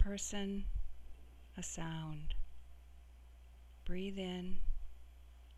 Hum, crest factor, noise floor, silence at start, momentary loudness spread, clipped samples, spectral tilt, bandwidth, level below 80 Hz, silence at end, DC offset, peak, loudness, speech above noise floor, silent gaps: 60 Hz at -60 dBFS; 20 dB; -58 dBFS; 0 s; 20 LU; under 0.1%; -4.5 dB/octave; 12.5 kHz; -46 dBFS; 0 s; under 0.1%; -18 dBFS; -45 LUFS; 21 dB; none